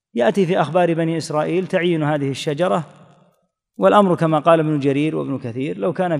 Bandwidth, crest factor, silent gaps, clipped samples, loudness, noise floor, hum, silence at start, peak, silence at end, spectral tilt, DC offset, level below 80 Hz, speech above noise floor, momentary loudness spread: 12 kHz; 18 dB; none; under 0.1%; -18 LUFS; -64 dBFS; none; 0.15 s; -2 dBFS; 0 s; -7 dB/octave; under 0.1%; -68 dBFS; 46 dB; 9 LU